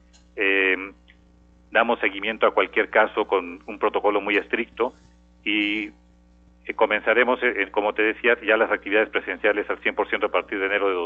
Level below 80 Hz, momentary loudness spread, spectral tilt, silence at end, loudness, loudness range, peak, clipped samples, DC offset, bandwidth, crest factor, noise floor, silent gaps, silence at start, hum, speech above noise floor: -56 dBFS; 8 LU; -5.5 dB/octave; 0 s; -22 LUFS; 4 LU; -4 dBFS; under 0.1%; under 0.1%; 7 kHz; 20 dB; -54 dBFS; none; 0.35 s; 60 Hz at -55 dBFS; 32 dB